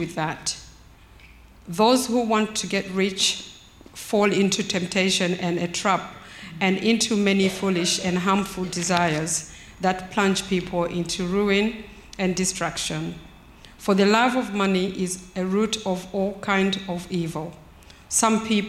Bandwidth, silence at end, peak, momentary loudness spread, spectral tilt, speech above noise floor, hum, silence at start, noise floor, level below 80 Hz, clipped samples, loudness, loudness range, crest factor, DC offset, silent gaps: 14.5 kHz; 0 s; -2 dBFS; 11 LU; -4 dB/octave; 26 dB; none; 0 s; -49 dBFS; -52 dBFS; under 0.1%; -23 LUFS; 3 LU; 22 dB; under 0.1%; none